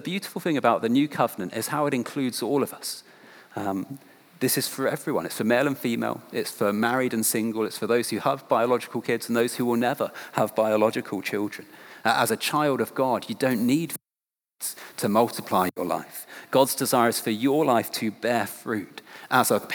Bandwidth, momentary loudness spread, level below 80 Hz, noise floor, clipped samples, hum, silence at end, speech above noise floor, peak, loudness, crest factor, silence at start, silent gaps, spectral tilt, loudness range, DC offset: over 20 kHz; 11 LU; -80 dBFS; under -90 dBFS; under 0.1%; none; 0 s; over 65 dB; -6 dBFS; -25 LUFS; 20 dB; 0 s; none; -4 dB/octave; 3 LU; under 0.1%